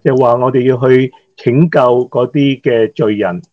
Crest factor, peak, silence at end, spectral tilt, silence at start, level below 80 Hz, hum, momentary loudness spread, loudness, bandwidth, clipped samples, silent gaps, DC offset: 12 dB; 0 dBFS; 0.1 s; -9 dB/octave; 0.05 s; -56 dBFS; none; 5 LU; -12 LUFS; 6.6 kHz; 0.3%; none; under 0.1%